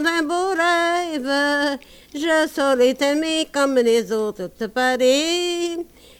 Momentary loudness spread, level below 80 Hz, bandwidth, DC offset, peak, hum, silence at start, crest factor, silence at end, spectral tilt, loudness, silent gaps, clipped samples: 9 LU; -56 dBFS; 19 kHz; under 0.1%; -6 dBFS; none; 0 s; 14 dB; 0.35 s; -2.5 dB/octave; -20 LUFS; none; under 0.1%